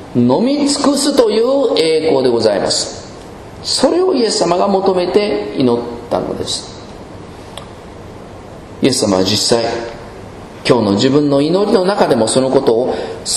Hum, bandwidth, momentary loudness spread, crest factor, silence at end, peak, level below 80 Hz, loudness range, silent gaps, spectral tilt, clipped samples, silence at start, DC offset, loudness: none; 13 kHz; 20 LU; 14 dB; 0 s; 0 dBFS; -44 dBFS; 6 LU; none; -4.5 dB/octave; under 0.1%; 0 s; under 0.1%; -14 LUFS